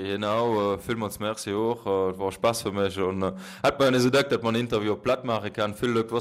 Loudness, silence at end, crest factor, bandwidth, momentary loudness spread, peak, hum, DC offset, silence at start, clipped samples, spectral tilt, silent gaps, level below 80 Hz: -26 LUFS; 0 s; 14 dB; 16 kHz; 8 LU; -12 dBFS; none; under 0.1%; 0 s; under 0.1%; -5 dB/octave; none; -56 dBFS